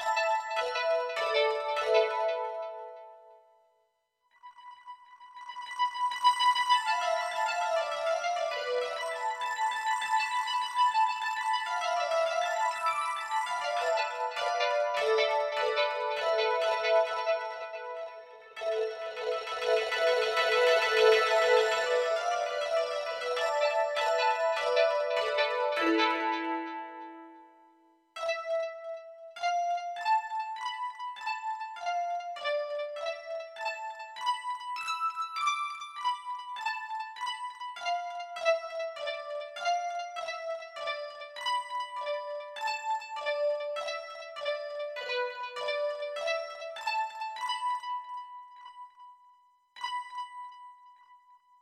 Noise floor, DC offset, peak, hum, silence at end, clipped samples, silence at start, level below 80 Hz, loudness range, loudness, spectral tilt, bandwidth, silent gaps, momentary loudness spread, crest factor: -75 dBFS; under 0.1%; -10 dBFS; none; 0.45 s; under 0.1%; 0 s; -80 dBFS; 8 LU; -31 LUFS; 0 dB/octave; 15 kHz; none; 14 LU; 20 dB